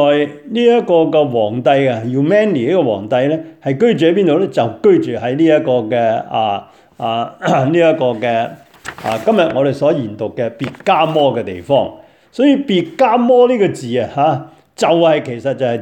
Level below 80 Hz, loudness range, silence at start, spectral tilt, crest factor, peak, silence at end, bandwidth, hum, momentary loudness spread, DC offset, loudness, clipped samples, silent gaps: -58 dBFS; 3 LU; 0 s; -7 dB/octave; 14 dB; 0 dBFS; 0 s; 10 kHz; none; 9 LU; under 0.1%; -14 LUFS; under 0.1%; none